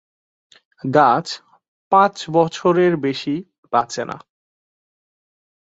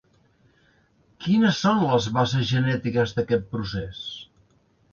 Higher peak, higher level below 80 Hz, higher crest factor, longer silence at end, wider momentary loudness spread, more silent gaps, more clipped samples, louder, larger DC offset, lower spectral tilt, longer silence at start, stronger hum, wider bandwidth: first, 0 dBFS vs -8 dBFS; second, -66 dBFS vs -52 dBFS; about the same, 20 dB vs 18 dB; first, 1.6 s vs 0.7 s; about the same, 15 LU vs 14 LU; first, 1.68-1.91 s, 3.58-3.63 s vs none; neither; first, -18 LUFS vs -23 LUFS; neither; about the same, -5.5 dB/octave vs -6 dB/octave; second, 0.85 s vs 1.2 s; neither; first, 8 kHz vs 7.2 kHz